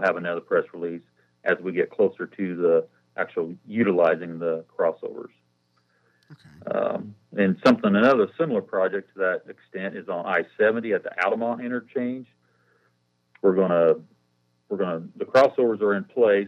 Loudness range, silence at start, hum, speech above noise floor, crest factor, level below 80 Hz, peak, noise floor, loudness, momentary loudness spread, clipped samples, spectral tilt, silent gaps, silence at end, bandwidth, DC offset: 4 LU; 0 s; none; 45 dB; 22 dB; -74 dBFS; -4 dBFS; -69 dBFS; -24 LUFS; 14 LU; under 0.1%; -7.5 dB/octave; none; 0 s; 8 kHz; under 0.1%